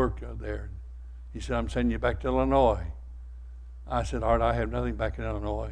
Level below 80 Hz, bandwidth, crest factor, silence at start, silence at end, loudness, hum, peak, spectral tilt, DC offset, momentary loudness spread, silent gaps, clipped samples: -36 dBFS; 10 kHz; 20 dB; 0 s; 0 s; -29 LUFS; none; -10 dBFS; -7 dB/octave; under 0.1%; 21 LU; none; under 0.1%